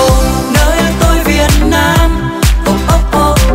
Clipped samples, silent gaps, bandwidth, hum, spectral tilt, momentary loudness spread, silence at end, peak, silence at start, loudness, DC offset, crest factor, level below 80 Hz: under 0.1%; none; 16.5 kHz; none; -5 dB/octave; 3 LU; 0 s; 0 dBFS; 0 s; -10 LUFS; under 0.1%; 8 dB; -12 dBFS